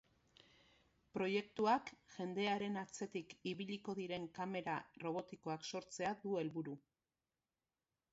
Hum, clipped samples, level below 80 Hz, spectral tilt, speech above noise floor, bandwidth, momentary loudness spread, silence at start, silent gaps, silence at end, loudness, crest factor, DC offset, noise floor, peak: none; under 0.1%; -82 dBFS; -4 dB/octave; over 47 dB; 7.6 kHz; 9 LU; 1.15 s; none; 1.35 s; -43 LUFS; 22 dB; under 0.1%; under -90 dBFS; -24 dBFS